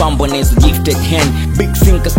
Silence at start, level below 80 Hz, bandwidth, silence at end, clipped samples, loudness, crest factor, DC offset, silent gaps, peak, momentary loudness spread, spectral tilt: 0 s; -14 dBFS; 17 kHz; 0 s; 0.2%; -12 LUFS; 10 dB; under 0.1%; none; 0 dBFS; 4 LU; -5.5 dB/octave